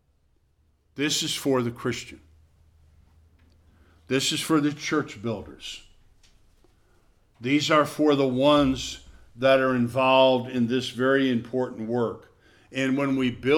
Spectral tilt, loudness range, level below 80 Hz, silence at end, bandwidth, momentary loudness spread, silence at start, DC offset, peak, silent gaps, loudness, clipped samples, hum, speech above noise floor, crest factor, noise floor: -4.5 dB/octave; 8 LU; -54 dBFS; 0 s; 17 kHz; 15 LU; 0.95 s; under 0.1%; -6 dBFS; none; -24 LUFS; under 0.1%; none; 42 dB; 18 dB; -65 dBFS